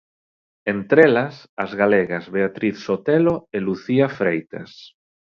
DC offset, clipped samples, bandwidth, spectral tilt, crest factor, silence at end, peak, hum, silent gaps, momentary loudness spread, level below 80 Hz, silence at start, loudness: under 0.1%; under 0.1%; 6.8 kHz; -8 dB/octave; 20 dB; 0.55 s; 0 dBFS; none; 1.49-1.57 s; 14 LU; -58 dBFS; 0.65 s; -20 LUFS